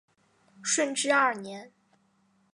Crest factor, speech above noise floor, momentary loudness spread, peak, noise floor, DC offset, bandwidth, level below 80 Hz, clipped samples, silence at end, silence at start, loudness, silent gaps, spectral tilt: 20 dB; 41 dB; 18 LU; -10 dBFS; -68 dBFS; under 0.1%; 11.5 kHz; -86 dBFS; under 0.1%; 0.85 s; 0.6 s; -26 LUFS; none; -1 dB/octave